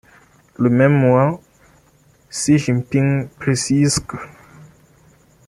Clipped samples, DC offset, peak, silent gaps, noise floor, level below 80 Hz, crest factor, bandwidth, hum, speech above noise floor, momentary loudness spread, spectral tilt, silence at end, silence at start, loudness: under 0.1%; under 0.1%; -2 dBFS; none; -54 dBFS; -48 dBFS; 18 dB; 12.5 kHz; none; 38 dB; 18 LU; -6 dB/octave; 1.2 s; 0.6 s; -17 LUFS